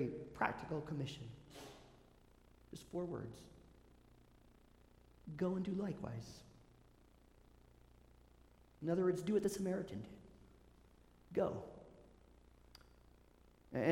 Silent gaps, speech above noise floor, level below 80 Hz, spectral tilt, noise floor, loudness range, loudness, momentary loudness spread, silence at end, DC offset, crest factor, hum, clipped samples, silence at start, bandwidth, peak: none; 26 dB; -68 dBFS; -6.5 dB/octave; -67 dBFS; 10 LU; -42 LUFS; 26 LU; 0 s; under 0.1%; 26 dB; 60 Hz at -70 dBFS; under 0.1%; 0 s; 16.5 kHz; -20 dBFS